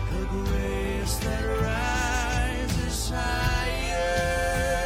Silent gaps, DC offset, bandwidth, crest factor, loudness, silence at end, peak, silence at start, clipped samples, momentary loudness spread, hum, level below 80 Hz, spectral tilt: none; under 0.1%; 16.5 kHz; 12 dB; -27 LUFS; 0 s; -14 dBFS; 0 s; under 0.1%; 3 LU; none; -30 dBFS; -4.5 dB/octave